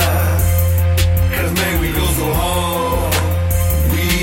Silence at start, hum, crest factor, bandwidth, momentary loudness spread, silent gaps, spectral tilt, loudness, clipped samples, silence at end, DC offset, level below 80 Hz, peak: 0 s; none; 10 dB; 17 kHz; 2 LU; none; -5 dB/octave; -16 LUFS; under 0.1%; 0 s; under 0.1%; -22 dBFS; -4 dBFS